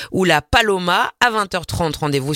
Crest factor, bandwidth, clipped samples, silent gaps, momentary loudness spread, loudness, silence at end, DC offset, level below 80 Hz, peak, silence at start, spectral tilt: 18 dB; 16.5 kHz; under 0.1%; none; 7 LU; -17 LUFS; 0 s; under 0.1%; -38 dBFS; 0 dBFS; 0 s; -4 dB/octave